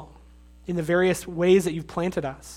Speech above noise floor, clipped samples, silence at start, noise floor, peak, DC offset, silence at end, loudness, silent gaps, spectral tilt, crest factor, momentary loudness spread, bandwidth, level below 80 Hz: 26 dB; under 0.1%; 0 s; -50 dBFS; -8 dBFS; under 0.1%; 0 s; -24 LUFS; none; -6 dB/octave; 16 dB; 11 LU; 16 kHz; -50 dBFS